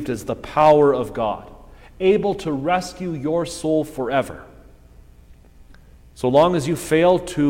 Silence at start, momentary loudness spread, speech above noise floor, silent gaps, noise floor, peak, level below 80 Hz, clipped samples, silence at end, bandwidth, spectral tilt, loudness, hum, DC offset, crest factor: 0 s; 11 LU; 28 dB; none; -47 dBFS; -2 dBFS; -46 dBFS; under 0.1%; 0 s; 16.5 kHz; -6 dB/octave; -19 LUFS; 60 Hz at -50 dBFS; under 0.1%; 18 dB